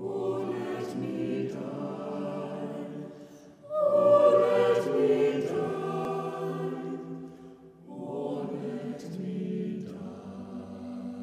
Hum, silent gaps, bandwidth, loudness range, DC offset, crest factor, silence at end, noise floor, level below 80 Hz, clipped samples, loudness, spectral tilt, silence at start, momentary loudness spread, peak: none; none; 11 kHz; 11 LU; under 0.1%; 18 dB; 0 s; -50 dBFS; -72 dBFS; under 0.1%; -29 LUFS; -7.5 dB/octave; 0 s; 18 LU; -10 dBFS